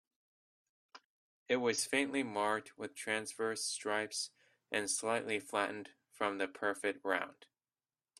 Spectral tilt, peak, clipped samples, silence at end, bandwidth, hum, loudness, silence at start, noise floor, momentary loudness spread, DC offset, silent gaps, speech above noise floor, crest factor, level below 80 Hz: -2 dB/octave; -16 dBFS; under 0.1%; 0.85 s; 15.5 kHz; none; -37 LUFS; 0.95 s; under -90 dBFS; 8 LU; under 0.1%; 1.04-1.46 s; over 53 dB; 22 dB; -82 dBFS